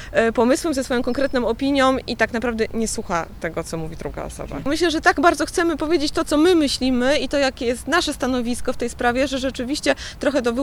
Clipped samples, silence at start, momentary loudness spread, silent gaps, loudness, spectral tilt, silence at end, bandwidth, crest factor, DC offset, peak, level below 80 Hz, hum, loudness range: under 0.1%; 0 s; 10 LU; none; -21 LUFS; -4 dB/octave; 0 s; 19 kHz; 20 dB; under 0.1%; -2 dBFS; -38 dBFS; none; 4 LU